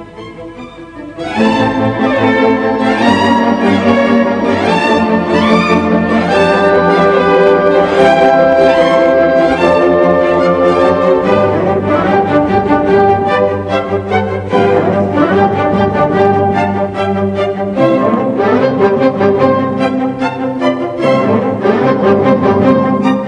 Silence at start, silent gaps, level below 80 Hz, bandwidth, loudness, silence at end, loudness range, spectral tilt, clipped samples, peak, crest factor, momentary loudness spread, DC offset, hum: 0 s; none; -40 dBFS; 10 kHz; -11 LUFS; 0 s; 3 LU; -7 dB/octave; 0.3%; 0 dBFS; 10 dB; 6 LU; under 0.1%; none